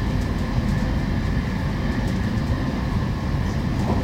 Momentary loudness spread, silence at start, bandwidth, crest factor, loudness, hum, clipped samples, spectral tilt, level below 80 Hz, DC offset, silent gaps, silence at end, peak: 1 LU; 0 s; 16 kHz; 14 dB; -24 LUFS; none; under 0.1%; -7 dB/octave; -28 dBFS; under 0.1%; none; 0 s; -8 dBFS